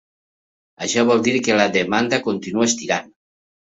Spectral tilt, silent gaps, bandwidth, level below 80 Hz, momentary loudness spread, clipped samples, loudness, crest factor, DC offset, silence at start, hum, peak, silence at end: -3.5 dB/octave; none; 8 kHz; -60 dBFS; 7 LU; under 0.1%; -19 LUFS; 18 dB; under 0.1%; 0.8 s; none; -2 dBFS; 0.75 s